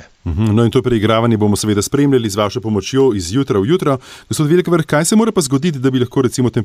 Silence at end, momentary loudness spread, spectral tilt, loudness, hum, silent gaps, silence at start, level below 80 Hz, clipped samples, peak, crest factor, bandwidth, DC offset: 0 s; 5 LU; -6 dB/octave; -15 LUFS; none; none; 0 s; -40 dBFS; under 0.1%; -2 dBFS; 12 dB; 16 kHz; under 0.1%